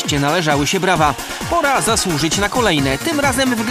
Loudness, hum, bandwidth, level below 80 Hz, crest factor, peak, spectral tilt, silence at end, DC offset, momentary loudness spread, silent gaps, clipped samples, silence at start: -16 LUFS; none; 15.5 kHz; -36 dBFS; 16 dB; 0 dBFS; -3.5 dB/octave; 0 s; under 0.1%; 3 LU; none; under 0.1%; 0 s